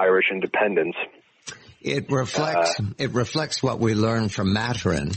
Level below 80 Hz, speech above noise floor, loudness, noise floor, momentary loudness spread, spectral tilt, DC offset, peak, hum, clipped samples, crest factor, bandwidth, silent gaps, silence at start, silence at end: -50 dBFS; 20 dB; -23 LUFS; -43 dBFS; 12 LU; -5 dB/octave; under 0.1%; -8 dBFS; none; under 0.1%; 14 dB; 8.8 kHz; none; 0 s; 0 s